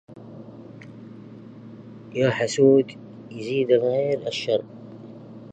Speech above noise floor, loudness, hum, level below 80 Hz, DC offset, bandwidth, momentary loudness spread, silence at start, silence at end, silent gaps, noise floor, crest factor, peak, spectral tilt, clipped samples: 21 dB; -22 LUFS; none; -68 dBFS; under 0.1%; 9 kHz; 24 LU; 0.1 s; 0.05 s; none; -42 dBFS; 20 dB; -6 dBFS; -5.5 dB/octave; under 0.1%